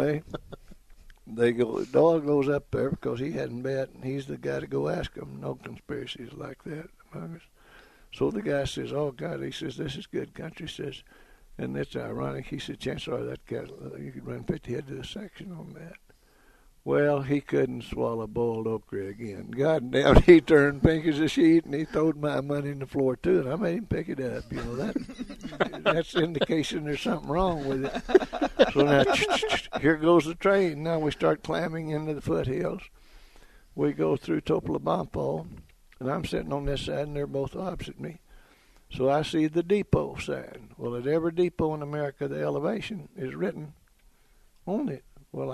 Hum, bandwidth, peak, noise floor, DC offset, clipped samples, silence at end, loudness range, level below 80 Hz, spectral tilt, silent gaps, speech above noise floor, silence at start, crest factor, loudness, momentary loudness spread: none; 13 kHz; -2 dBFS; -60 dBFS; under 0.1%; under 0.1%; 0 s; 13 LU; -44 dBFS; -6.5 dB/octave; none; 33 dB; 0 s; 26 dB; -27 LUFS; 17 LU